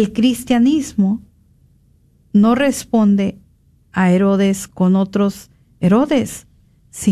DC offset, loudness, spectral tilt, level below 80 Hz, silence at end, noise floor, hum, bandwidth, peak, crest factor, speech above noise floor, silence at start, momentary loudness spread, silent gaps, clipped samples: under 0.1%; -16 LUFS; -6.5 dB/octave; -48 dBFS; 0 s; -53 dBFS; none; 14 kHz; -4 dBFS; 14 dB; 39 dB; 0 s; 11 LU; none; under 0.1%